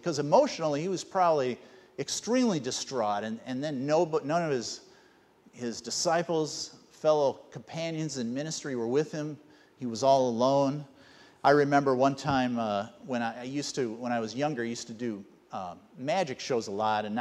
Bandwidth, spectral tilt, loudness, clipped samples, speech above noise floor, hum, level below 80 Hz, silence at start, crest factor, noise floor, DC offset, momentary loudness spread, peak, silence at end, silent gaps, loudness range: 13 kHz; -4.5 dB/octave; -29 LUFS; under 0.1%; 32 dB; none; -68 dBFS; 0.05 s; 20 dB; -61 dBFS; under 0.1%; 15 LU; -10 dBFS; 0 s; none; 6 LU